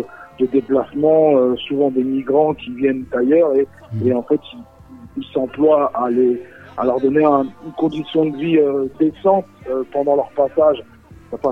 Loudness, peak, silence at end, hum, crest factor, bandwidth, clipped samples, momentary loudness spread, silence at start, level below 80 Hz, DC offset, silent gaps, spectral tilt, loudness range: -17 LUFS; -2 dBFS; 0 s; none; 16 dB; 4.2 kHz; under 0.1%; 10 LU; 0 s; -54 dBFS; under 0.1%; none; -9 dB/octave; 3 LU